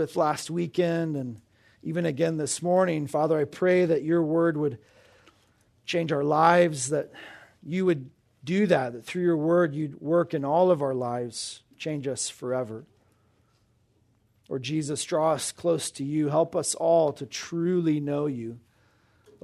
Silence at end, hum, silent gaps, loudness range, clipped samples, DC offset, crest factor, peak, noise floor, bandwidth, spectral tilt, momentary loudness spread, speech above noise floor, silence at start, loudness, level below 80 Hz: 0.85 s; none; none; 6 LU; under 0.1%; under 0.1%; 20 dB; -6 dBFS; -66 dBFS; 13.5 kHz; -5.5 dB/octave; 13 LU; 41 dB; 0 s; -26 LUFS; -70 dBFS